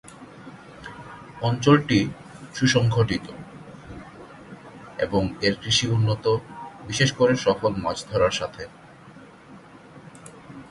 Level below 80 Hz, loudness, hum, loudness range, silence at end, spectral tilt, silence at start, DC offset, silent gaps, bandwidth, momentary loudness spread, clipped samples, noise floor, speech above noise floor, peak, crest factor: -50 dBFS; -22 LUFS; none; 3 LU; 0.05 s; -5 dB/octave; 0.05 s; under 0.1%; none; 11.5 kHz; 24 LU; under 0.1%; -47 dBFS; 25 dB; -4 dBFS; 22 dB